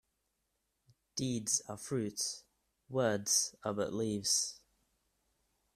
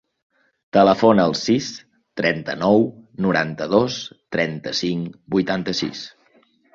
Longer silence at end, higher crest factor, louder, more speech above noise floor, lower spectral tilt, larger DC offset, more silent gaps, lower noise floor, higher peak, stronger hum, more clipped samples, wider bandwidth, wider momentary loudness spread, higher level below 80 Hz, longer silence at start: first, 1.2 s vs 0.65 s; about the same, 22 dB vs 20 dB; second, -34 LUFS vs -20 LUFS; first, 47 dB vs 39 dB; second, -3 dB/octave vs -5.5 dB/octave; neither; neither; first, -83 dBFS vs -58 dBFS; second, -16 dBFS vs -2 dBFS; neither; neither; first, 15.5 kHz vs 7.6 kHz; second, 9 LU vs 14 LU; second, -72 dBFS vs -56 dBFS; first, 1.15 s vs 0.75 s